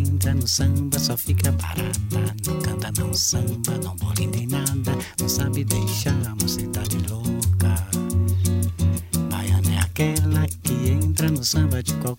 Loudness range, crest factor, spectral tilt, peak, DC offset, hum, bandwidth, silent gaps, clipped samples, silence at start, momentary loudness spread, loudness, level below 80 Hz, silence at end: 2 LU; 18 dB; -4.5 dB/octave; -4 dBFS; under 0.1%; none; 16.5 kHz; none; under 0.1%; 0 s; 5 LU; -22 LUFS; -36 dBFS; 0 s